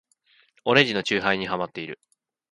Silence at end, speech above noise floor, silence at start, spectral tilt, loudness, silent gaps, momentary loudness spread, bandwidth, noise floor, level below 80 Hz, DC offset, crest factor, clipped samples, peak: 0.6 s; 39 dB; 0.65 s; -4.5 dB/octave; -23 LUFS; none; 17 LU; 11.5 kHz; -63 dBFS; -62 dBFS; under 0.1%; 24 dB; under 0.1%; -2 dBFS